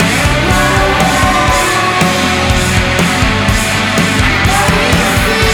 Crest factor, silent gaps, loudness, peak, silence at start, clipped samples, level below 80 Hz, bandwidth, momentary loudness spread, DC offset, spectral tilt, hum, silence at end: 10 dB; none; -10 LUFS; 0 dBFS; 0 s; under 0.1%; -20 dBFS; over 20 kHz; 1 LU; under 0.1%; -4 dB/octave; none; 0 s